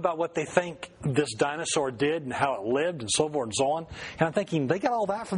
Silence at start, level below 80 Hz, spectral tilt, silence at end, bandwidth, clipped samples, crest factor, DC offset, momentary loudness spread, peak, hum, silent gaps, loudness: 0 s; -60 dBFS; -4 dB/octave; 0 s; 10.5 kHz; under 0.1%; 22 dB; under 0.1%; 3 LU; -6 dBFS; none; none; -28 LUFS